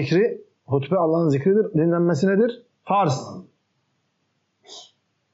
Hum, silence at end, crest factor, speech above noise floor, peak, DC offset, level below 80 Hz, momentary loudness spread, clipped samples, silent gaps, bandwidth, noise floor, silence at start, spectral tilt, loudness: none; 0.5 s; 14 dB; 51 dB; -10 dBFS; under 0.1%; -70 dBFS; 21 LU; under 0.1%; none; 8 kHz; -71 dBFS; 0 s; -7 dB/octave; -21 LUFS